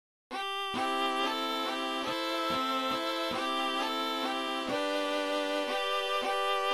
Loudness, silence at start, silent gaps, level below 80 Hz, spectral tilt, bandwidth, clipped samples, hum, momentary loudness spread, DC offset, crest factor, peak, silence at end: -31 LUFS; 0.3 s; none; -70 dBFS; -2 dB/octave; 16 kHz; under 0.1%; none; 3 LU; 0.1%; 14 dB; -18 dBFS; 0 s